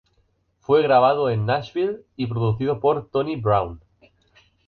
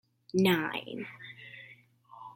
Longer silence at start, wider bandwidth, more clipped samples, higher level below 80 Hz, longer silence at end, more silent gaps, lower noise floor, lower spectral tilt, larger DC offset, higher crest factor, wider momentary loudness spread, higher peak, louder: first, 0.7 s vs 0.35 s; second, 6.4 kHz vs 16.5 kHz; neither; first, -50 dBFS vs -74 dBFS; first, 0.9 s vs 0.05 s; neither; first, -66 dBFS vs -57 dBFS; first, -9 dB/octave vs -5.5 dB/octave; neither; about the same, 18 dB vs 22 dB; second, 11 LU vs 23 LU; first, -6 dBFS vs -12 dBFS; first, -21 LUFS vs -30 LUFS